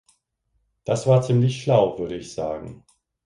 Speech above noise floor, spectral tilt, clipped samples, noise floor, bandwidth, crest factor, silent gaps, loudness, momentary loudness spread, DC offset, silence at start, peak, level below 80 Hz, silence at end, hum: 51 dB; -7 dB/octave; under 0.1%; -72 dBFS; 11 kHz; 18 dB; none; -22 LUFS; 15 LU; under 0.1%; 0.85 s; -6 dBFS; -54 dBFS; 0.5 s; none